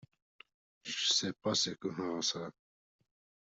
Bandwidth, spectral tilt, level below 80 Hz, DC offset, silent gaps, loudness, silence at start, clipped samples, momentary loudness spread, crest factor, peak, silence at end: 8.2 kHz; -2 dB/octave; -80 dBFS; under 0.1%; none; -33 LUFS; 0.85 s; under 0.1%; 13 LU; 20 dB; -18 dBFS; 1 s